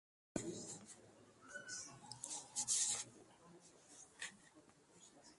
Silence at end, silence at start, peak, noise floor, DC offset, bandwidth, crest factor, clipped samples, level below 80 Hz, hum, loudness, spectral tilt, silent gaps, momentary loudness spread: 0 s; 0.35 s; -24 dBFS; -68 dBFS; under 0.1%; 11.5 kHz; 24 dB; under 0.1%; -80 dBFS; none; -44 LUFS; -1 dB/octave; none; 27 LU